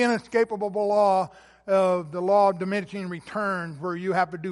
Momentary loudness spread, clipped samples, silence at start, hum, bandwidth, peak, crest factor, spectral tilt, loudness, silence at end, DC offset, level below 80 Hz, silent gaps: 11 LU; under 0.1%; 0 s; none; 11.5 kHz; -10 dBFS; 14 dB; -6 dB/octave; -25 LUFS; 0 s; under 0.1%; -66 dBFS; none